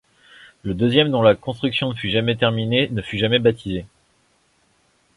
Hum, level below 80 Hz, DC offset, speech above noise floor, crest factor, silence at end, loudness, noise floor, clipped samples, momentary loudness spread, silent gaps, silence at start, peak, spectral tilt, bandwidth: none; -48 dBFS; under 0.1%; 43 dB; 20 dB; 1.3 s; -19 LUFS; -62 dBFS; under 0.1%; 12 LU; none; 0.65 s; -2 dBFS; -7 dB/octave; 11.5 kHz